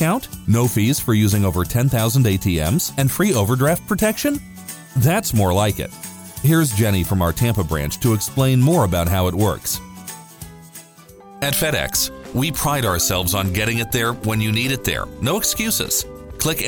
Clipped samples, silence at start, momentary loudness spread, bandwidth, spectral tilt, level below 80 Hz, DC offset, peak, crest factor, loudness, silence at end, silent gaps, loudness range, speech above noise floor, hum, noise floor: under 0.1%; 0 s; 11 LU; over 20 kHz; -4.5 dB/octave; -38 dBFS; under 0.1%; -2 dBFS; 16 dB; -19 LUFS; 0 s; none; 4 LU; 25 dB; none; -44 dBFS